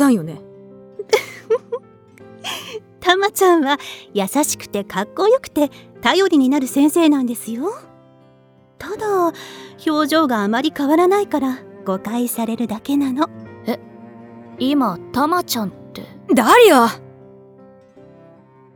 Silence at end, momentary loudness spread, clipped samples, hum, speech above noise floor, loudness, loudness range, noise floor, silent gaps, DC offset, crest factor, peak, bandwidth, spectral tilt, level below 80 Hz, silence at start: 1.75 s; 17 LU; under 0.1%; none; 34 dB; -18 LUFS; 6 LU; -51 dBFS; none; under 0.1%; 18 dB; 0 dBFS; over 20 kHz; -4 dB/octave; -60 dBFS; 0 s